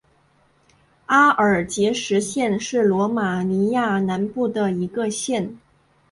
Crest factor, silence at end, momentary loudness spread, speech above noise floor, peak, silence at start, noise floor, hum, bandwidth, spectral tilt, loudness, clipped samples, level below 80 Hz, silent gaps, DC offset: 18 dB; 0.55 s; 9 LU; 40 dB; -2 dBFS; 1.1 s; -60 dBFS; none; 11.5 kHz; -5 dB/octave; -20 LUFS; under 0.1%; -58 dBFS; none; under 0.1%